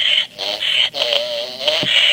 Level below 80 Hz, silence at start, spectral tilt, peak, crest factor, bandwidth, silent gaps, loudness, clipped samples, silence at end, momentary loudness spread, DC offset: -62 dBFS; 0 s; -1 dB/octave; 0 dBFS; 18 dB; 17 kHz; none; -16 LUFS; under 0.1%; 0 s; 7 LU; under 0.1%